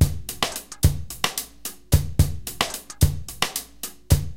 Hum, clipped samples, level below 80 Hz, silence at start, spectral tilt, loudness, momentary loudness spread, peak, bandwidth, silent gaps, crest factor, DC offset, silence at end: none; under 0.1%; -30 dBFS; 0 s; -4 dB/octave; -25 LUFS; 8 LU; -2 dBFS; 17 kHz; none; 22 dB; under 0.1%; 0 s